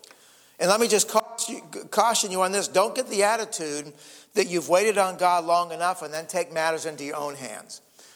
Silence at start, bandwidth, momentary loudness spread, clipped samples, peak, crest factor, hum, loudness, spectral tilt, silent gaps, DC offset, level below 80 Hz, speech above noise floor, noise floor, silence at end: 0.6 s; 19.5 kHz; 13 LU; under 0.1%; -4 dBFS; 20 dB; none; -24 LUFS; -2 dB/octave; none; under 0.1%; -76 dBFS; 29 dB; -54 dBFS; 0.35 s